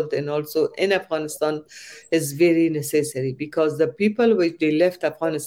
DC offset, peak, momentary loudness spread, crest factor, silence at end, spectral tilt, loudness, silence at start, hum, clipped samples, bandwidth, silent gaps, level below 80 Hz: under 0.1%; -6 dBFS; 8 LU; 14 dB; 0 s; -5.5 dB/octave; -22 LUFS; 0 s; none; under 0.1%; 16.5 kHz; none; -66 dBFS